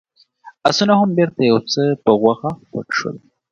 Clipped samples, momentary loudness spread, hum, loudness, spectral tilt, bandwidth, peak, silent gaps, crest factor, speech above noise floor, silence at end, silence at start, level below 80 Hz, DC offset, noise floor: under 0.1%; 12 LU; none; -17 LUFS; -5.5 dB/octave; 7.6 kHz; 0 dBFS; none; 18 dB; 29 dB; 0.35 s; 0.45 s; -58 dBFS; under 0.1%; -45 dBFS